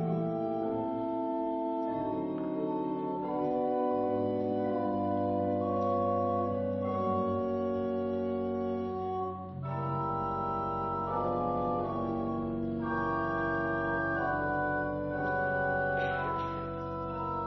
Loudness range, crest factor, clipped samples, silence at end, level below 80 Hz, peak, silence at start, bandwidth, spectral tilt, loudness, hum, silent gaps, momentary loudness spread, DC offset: 2 LU; 12 dB; under 0.1%; 0 s; -56 dBFS; -20 dBFS; 0 s; 6 kHz; -6.5 dB/octave; -32 LUFS; none; none; 4 LU; under 0.1%